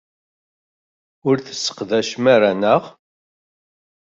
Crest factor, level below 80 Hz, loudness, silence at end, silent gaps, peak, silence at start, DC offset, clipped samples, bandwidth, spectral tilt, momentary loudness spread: 18 dB; -64 dBFS; -18 LUFS; 1.2 s; none; -2 dBFS; 1.25 s; under 0.1%; under 0.1%; 7.8 kHz; -4.5 dB/octave; 10 LU